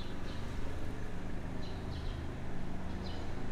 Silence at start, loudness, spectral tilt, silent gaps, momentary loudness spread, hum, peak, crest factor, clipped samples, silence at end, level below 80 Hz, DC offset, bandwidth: 0 s; -43 LUFS; -6.5 dB/octave; none; 2 LU; none; -26 dBFS; 10 dB; under 0.1%; 0 s; -42 dBFS; under 0.1%; 9.4 kHz